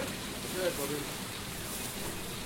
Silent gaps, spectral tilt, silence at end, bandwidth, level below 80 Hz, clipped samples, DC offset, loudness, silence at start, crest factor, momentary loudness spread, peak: none; -3 dB/octave; 0 s; 16.5 kHz; -52 dBFS; under 0.1%; under 0.1%; -36 LUFS; 0 s; 18 dB; 5 LU; -20 dBFS